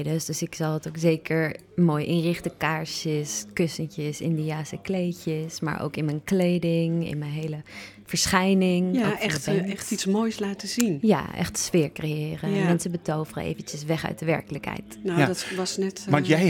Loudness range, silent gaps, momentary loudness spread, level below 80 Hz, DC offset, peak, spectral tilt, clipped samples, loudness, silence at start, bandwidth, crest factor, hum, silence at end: 4 LU; none; 9 LU; -56 dBFS; under 0.1%; -4 dBFS; -5 dB/octave; under 0.1%; -26 LUFS; 0 s; 18 kHz; 22 dB; none; 0 s